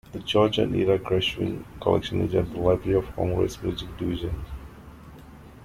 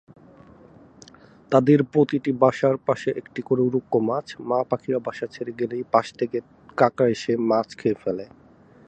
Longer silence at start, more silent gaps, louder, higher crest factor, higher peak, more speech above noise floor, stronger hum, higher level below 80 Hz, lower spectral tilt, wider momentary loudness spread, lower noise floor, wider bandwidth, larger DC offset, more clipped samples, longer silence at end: second, 0.1 s vs 1.5 s; neither; about the same, -25 LUFS vs -23 LUFS; about the same, 20 dB vs 22 dB; second, -6 dBFS vs -2 dBFS; second, 21 dB vs 27 dB; neither; first, -42 dBFS vs -64 dBFS; about the same, -6.5 dB/octave vs -7.5 dB/octave; about the same, 14 LU vs 13 LU; second, -45 dBFS vs -49 dBFS; first, 15.5 kHz vs 8.8 kHz; neither; neither; second, 0 s vs 0.65 s